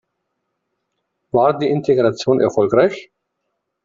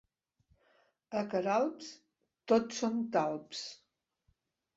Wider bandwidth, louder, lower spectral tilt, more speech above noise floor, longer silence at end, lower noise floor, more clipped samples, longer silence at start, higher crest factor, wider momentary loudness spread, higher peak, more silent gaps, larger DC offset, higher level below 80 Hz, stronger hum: about the same, 7.6 kHz vs 7.6 kHz; first, -16 LUFS vs -34 LUFS; first, -6.5 dB/octave vs -4 dB/octave; first, 59 dB vs 44 dB; second, 0.8 s vs 1 s; about the same, -75 dBFS vs -77 dBFS; neither; first, 1.35 s vs 1.1 s; second, 16 dB vs 22 dB; second, 4 LU vs 16 LU; first, -2 dBFS vs -14 dBFS; neither; neither; first, -56 dBFS vs -78 dBFS; neither